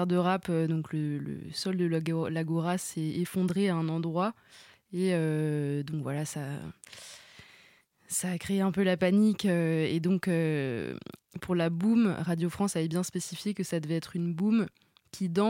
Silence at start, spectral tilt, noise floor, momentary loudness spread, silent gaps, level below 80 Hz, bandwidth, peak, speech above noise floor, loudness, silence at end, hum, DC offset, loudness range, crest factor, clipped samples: 0 s; -6 dB/octave; -62 dBFS; 12 LU; none; -66 dBFS; 16.5 kHz; -14 dBFS; 33 dB; -30 LUFS; 0 s; none; under 0.1%; 5 LU; 14 dB; under 0.1%